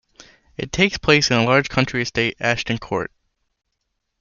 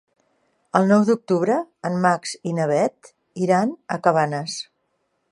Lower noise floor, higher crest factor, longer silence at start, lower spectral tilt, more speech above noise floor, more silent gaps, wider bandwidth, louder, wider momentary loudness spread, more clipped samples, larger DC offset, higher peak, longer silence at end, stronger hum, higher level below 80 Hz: first, -75 dBFS vs -71 dBFS; about the same, 20 dB vs 20 dB; second, 0.6 s vs 0.75 s; second, -4.5 dB/octave vs -6 dB/octave; first, 56 dB vs 51 dB; neither; second, 7.4 kHz vs 11.5 kHz; about the same, -19 LUFS vs -21 LUFS; first, 13 LU vs 10 LU; neither; neither; about the same, -2 dBFS vs -2 dBFS; first, 1.15 s vs 0.7 s; neither; first, -46 dBFS vs -72 dBFS